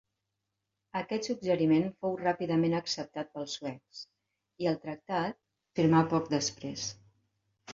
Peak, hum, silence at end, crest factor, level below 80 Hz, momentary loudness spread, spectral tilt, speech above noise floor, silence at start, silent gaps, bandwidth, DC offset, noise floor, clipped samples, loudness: -12 dBFS; none; 0 s; 20 dB; -70 dBFS; 13 LU; -5.5 dB/octave; 54 dB; 0.95 s; none; 7.6 kHz; under 0.1%; -85 dBFS; under 0.1%; -31 LUFS